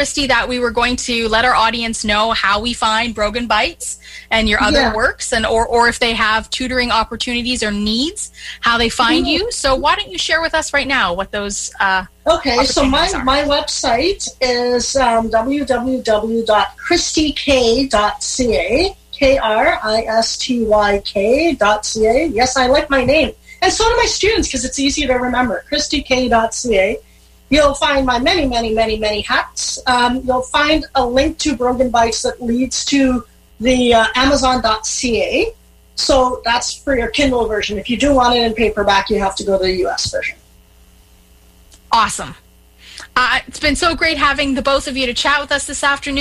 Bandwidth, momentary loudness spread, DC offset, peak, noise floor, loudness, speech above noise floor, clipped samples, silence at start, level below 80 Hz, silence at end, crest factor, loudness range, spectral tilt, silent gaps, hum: 15 kHz; 5 LU; under 0.1%; -2 dBFS; -47 dBFS; -15 LUFS; 32 dB; under 0.1%; 0 s; -32 dBFS; 0 s; 14 dB; 2 LU; -2.5 dB/octave; none; none